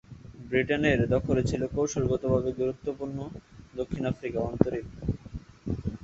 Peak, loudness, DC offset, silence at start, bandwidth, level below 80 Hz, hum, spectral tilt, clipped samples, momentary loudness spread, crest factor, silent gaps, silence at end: -2 dBFS; -29 LUFS; under 0.1%; 0.1 s; 8 kHz; -44 dBFS; none; -6.5 dB/octave; under 0.1%; 16 LU; 26 dB; none; 0.05 s